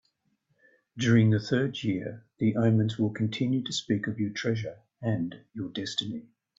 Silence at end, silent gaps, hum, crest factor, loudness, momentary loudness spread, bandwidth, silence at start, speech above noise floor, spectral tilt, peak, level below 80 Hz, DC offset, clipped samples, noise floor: 0.4 s; none; none; 18 dB; -28 LUFS; 13 LU; 7.8 kHz; 0.95 s; 46 dB; -6 dB/octave; -10 dBFS; -66 dBFS; under 0.1%; under 0.1%; -74 dBFS